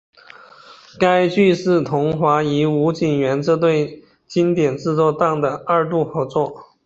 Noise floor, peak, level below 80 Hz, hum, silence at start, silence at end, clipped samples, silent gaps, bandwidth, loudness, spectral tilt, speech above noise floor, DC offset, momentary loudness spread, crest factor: -44 dBFS; -2 dBFS; -56 dBFS; none; 0.7 s; 0.2 s; under 0.1%; none; 8 kHz; -18 LUFS; -7 dB/octave; 27 dB; under 0.1%; 6 LU; 16 dB